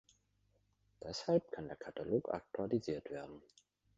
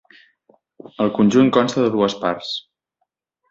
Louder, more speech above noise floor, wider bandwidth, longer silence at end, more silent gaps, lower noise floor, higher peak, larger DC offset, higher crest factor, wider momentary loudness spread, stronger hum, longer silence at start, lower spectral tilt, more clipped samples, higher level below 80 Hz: second, -40 LUFS vs -18 LUFS; second, 38 dB vs 57 dB; about the same, 8 kHz vs 7.8 kHz; second, 0.55 s vs 0.9 s; neither; about the same, -77 dBFS vs -75 dBFS; second, -20 dBFS vs -2 dBFS; neither; about the same, 20 dB vs 18 dB; about the same, 14 LU vs 12 LU; first, 50 Hz at -70 dBFS vs none; about the same, 1 s vs 1 s; about the same, -6.5 dB/octave vs -6 dB/octave; neither; second, -70 dBFS vs -58 dBFS